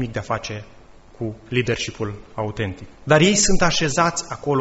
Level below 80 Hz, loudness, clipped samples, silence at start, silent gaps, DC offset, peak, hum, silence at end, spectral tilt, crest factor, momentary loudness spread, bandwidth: -36 dBFS; -21 LUFS; under 0.1%; 0 s; none; under 0.1%; -2 dBFS; none; 0 s; -4 dB/octave; 20 dB; 16 LU; 8.2 kHz